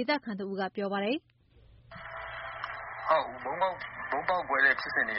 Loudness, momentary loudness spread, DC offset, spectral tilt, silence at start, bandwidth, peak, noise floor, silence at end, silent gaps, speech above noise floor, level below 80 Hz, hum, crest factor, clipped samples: -31 LUFS; 15 LU; under 0.1%; -2 dB/octave; 0 s; 5.8 kHz; -12 dBFS; -59 dBFS; 0 s; none; 29 dB; -62 dBFS; none; 20 dB; under 0.1%